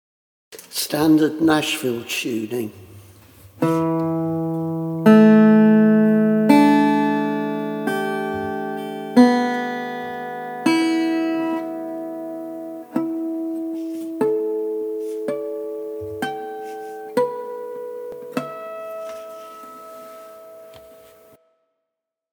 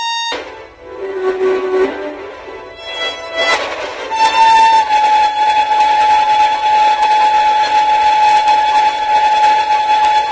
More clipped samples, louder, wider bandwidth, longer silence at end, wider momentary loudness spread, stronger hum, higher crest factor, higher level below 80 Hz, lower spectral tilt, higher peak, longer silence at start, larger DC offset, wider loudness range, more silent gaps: neither; second, -20 LUFS vs -12 LUFS; first, 19 kHz vs 8 kHz; first, 1.4 s vs 0 s; first, 18 LU vs 15 LU; neither; first, 20 dB vs 12 dB; second, -66 dBFS vs -48 dBFS; first, -6 dB/octave vs -1.5 dB/octave; about the same, 0 dBFS vs 0 dBFS; first, 0.5 s vs 0 s; neither; first, 15 LU vs 7 LU; neither